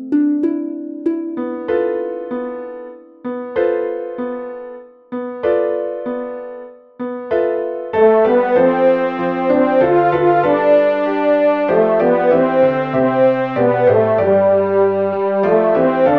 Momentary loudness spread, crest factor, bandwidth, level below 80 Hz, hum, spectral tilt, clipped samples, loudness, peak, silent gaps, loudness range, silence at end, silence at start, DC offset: 14 LU; 14 dB; 5 kHz; -56 dBFS; none; -9.5 dB/octave; under 0.1%; -15 LUFS; -2 dBFS; none; 9 LU; 0 s; 0 s; under 0.1%